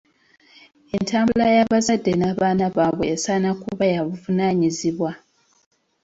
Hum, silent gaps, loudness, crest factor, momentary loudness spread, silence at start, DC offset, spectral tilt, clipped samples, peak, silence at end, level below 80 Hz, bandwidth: none; none; -20 LUFS; 16 dB; 9 LU; 0.95 s; under 0.1%; -5.5 dB/octave; under 0.1%; -4 dBFS; 0.85 s; -54 dBFS; 8 kHz